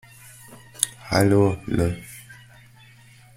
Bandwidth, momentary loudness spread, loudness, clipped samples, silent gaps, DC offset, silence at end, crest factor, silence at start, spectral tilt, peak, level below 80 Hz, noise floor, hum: 16.5 kHz; 25 LU; -22 LUFS; under 0.1%; none; under 0.1%; 1.05 s; 24 dB; 0.5 s; -5 dB/octave; 0 dBFS; -46 dBFS; -50 dBFS; none